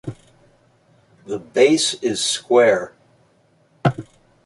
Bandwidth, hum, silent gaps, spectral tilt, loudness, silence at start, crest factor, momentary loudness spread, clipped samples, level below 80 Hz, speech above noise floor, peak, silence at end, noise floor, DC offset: 11.5 kHz; none; none; -4 dB/octave; -18 LUFS; 0.05 s; 18 dB; 19 LU; under 0.1%; -58 dBFS; 41 dB; -2 dBFS; 0.45 s; -58 dBFS; under 0.1%